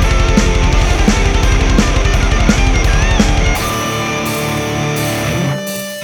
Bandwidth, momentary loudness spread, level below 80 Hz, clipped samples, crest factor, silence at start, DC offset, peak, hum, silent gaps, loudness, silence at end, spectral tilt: 20 kHz; 4 LU; -14 dBFS; 0.1%; 12 dB; 0 s; under 0.1%; 0 dBFS; none; none; -14 LUFS; 0 s; -4.5 dB/octave